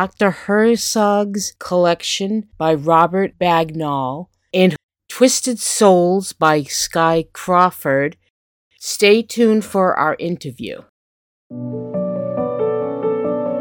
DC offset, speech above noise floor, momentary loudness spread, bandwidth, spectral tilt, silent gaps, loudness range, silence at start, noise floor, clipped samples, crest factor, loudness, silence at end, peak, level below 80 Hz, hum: under 0.1%; over 74 dB; 12 LU; 19 kHz; -4.5 dB/octave; 4.83-4.89 s, 8.30-8.71 s, 10.89-11.50 s; 6 LU; 0 s; under -90 dBFS; under 0.1%; 18 dB; -17 LUFS; 0 s; 0 dBFS; -56 dBFS; none